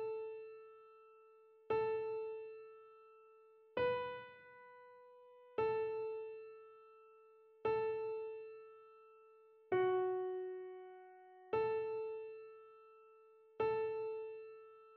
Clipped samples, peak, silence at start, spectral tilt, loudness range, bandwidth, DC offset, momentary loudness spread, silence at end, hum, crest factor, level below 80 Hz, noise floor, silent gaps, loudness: under 0.1%; -26 dBFS; 0 s; -4.5 dB/octave; 5 LU; 4.8 kHz; under 0.1%; 24 LU; 0 s; none; 18 dB; -80 dBFS; -65 dBFS; none; -41 LUFS